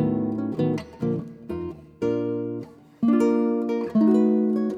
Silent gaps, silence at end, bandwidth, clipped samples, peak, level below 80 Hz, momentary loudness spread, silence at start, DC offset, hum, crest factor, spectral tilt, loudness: none; 0 s; 7.4 kHz; under 0.1%; -10 dBFS; -58 dBFS; 13 LU; 0 s; under 0.1%; none; 14 dB; -9 dB/octave; -24 LUFS